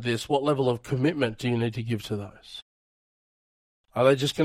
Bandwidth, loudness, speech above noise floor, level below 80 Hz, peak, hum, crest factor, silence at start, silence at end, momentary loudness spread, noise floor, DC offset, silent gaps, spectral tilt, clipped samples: 16 kHz; -26 LUFS; over 64 dB; -60 dBFS; -10 dBFS; none; 18 dB; 0 s; 0 s; 18 LU; under -90 dBFS; under 0.1%; 2.62-3.84 s; -6 dB/octave; under 0.1%